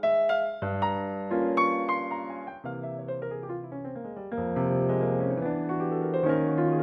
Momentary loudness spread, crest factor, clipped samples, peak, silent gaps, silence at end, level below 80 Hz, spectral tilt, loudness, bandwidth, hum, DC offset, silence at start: 13 LU; 16 dB; under 0.1%; -12 dBFS; none; 0 s; -64 dBFS; -9.5 dB/octave; -29 LUFS; 6.2 kHz; none; under 0.1%; 0 s